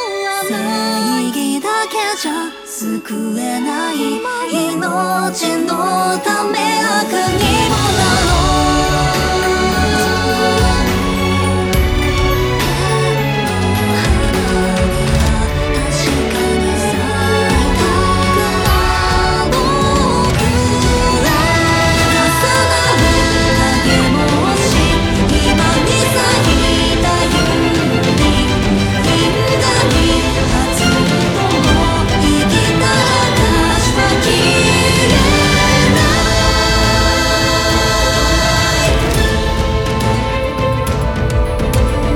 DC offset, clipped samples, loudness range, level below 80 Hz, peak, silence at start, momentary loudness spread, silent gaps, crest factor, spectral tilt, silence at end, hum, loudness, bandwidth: under 0.1%; under 0.1%; 5 LU; -22 dBFS; 0 dBFS; 0 s; 5 LU; none; 12 dB; -4.5 dB/octave; 0 s; none; -13 LUFS; 19 kHz